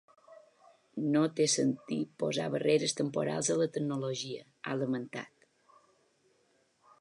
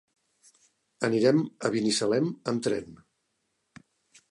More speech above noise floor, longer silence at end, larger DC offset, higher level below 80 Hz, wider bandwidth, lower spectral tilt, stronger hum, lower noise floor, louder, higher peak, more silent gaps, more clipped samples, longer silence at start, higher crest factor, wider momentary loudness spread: second, 40 dB vs 51 dB; first, 1.75 s vs 1.35 s; neither; second, -82 dBFS vs -70 dBFS; about the same, 11.5 kHz vs 11.5 kHz; about the same, -4.5 dB/octave vs -5 dB/octave; neither; second, -72 dBFS vs -77 dBFS; second, -32 LUFS vs -27 LUFS; second, -16 dBFS vs -10 dBFS; neither; neither; second, 0.3 s vs 1 s; about the same, 18 dB vs 20 dB; first, 14 LU vs 8 LU